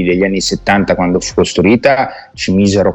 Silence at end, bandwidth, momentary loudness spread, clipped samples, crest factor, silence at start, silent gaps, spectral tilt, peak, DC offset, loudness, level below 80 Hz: 0 s; 8.6 kHz; 5 LU; under 0.1%; 12 dB; 0 s; none; -5 dB/octave; 0 dBFS; under 0.1%; -12 LUFS; -36 dBFS